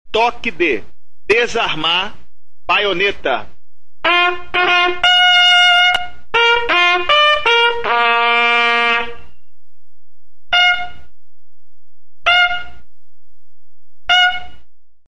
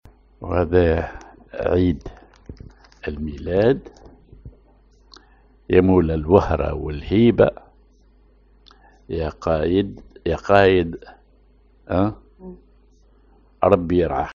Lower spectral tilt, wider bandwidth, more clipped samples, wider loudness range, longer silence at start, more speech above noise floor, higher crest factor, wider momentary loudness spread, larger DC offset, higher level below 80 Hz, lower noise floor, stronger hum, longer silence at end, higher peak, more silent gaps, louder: second, -2 dB/octave vs -6.5 dB/octave; first, 11.5 kHz vs 7.2 kHz; neither; about the same, 7 LU vs 6 LU; second, 0.05 s vs 0.4 s; first, 49 dB vs 36 dB; second, 14 dB vs 22 dB; second, 12 LU vs 22 LU; first, 5% vs under 0.1%; second, -46 dBFS vs -38 dBFS; first, -65 dBFS vs -54 dBFS; neither; about the same, 0.1 s vs 0 s; about the same, -2 dBFS vs 0 dBFS; neither; first, -13 LUFS vs -20 LUFS